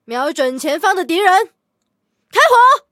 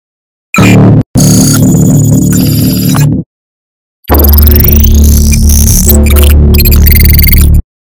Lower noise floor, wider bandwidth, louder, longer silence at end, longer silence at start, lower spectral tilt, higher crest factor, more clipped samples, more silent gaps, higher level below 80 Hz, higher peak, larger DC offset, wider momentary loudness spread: second, -71 dBFS vs under -90 dBFS; second, 17 kHz vs over 20 kHz; second, -13 LUFS vs -5 LUFS; second, 0.15 s vs 0.35 s; second, 0.1 s vs 0.55 s; second, -1 dB/octave vs -5.5 dB/octave; first, 14 dB vs 4 dB; second, under 0.1% vs 20%; second, none vs 1.06-1.14 s, 3.26-4.03 s; second, -74 dBFS vs -8 dBFS; about the same, 0 dBFS vs 0 dBFS; neither; first, 11 LU vs 4 LU